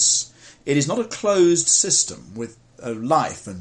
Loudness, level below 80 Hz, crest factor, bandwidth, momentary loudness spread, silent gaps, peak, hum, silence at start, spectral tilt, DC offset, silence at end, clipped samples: -19 LUFS; -60 dBFS; 18 dB; 11 kHz; 19 LU; none; -4 dBFS; none; 0 s; -3 dB/octave; under 0.1%; 0 s; under 0.1%